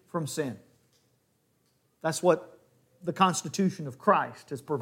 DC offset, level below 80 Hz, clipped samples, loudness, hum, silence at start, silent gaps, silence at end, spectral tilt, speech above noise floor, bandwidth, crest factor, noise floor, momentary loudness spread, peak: under 0.1%; -76 dBFS; under 0.1%; -29 LUFS; none; 0.15 s; none; 0 s; -5 dB/octave; 43 dB; 16.5 kHz; 24 dB; -71 dBFS; 12 LU; -6 dBFS